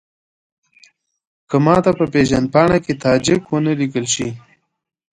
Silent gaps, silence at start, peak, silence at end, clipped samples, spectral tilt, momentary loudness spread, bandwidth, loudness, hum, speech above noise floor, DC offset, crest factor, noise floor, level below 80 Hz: none; 1.5 s; 0 dBFS; 0.75 s; under 0.1%; -5.5 dB/octave; 7 LU; 10.5 kHz; -16 LUFS; none; 38 dB; under 0.1%; 18 dB; -53 dBFS; -44 dBFS